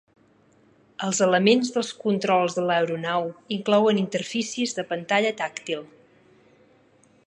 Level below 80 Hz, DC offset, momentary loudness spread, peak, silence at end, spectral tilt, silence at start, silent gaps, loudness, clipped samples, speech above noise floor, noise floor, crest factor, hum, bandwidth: -76 dBFS; under 0.1%; 11 LU; -4 dBFS; 1.4 s; -4 dB/octave; 1 s; none; -24 LUFS; under 0.1%; 36 dB; -59 dBFS; 20 dB; none; 10.5 kHz